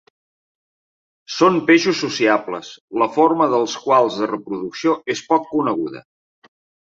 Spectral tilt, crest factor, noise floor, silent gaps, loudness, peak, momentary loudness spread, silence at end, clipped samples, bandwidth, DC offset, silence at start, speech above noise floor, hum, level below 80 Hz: -4.5 dB/octave; 18 dB; under -90 dBFS; 2.81-2.88 s; -18 LUFS; -2 dBFS; 13 LU; 0.85 s; under 0.1%; 7.8 kHz; under 0.1%; 1.3 s; over 72 dB; none; -66 dBFS